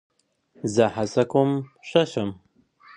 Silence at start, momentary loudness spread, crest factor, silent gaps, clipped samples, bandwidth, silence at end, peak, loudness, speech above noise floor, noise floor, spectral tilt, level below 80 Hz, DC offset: 0.65 s; 9 LU; 22 dB; none; under 0.1%; 10.5 kHz; 0.65 s; -2 dBFS; -24 LUFS; 31 dB; -54 dBFS; -6 dB/octave; -60 dBFS; under 0.1%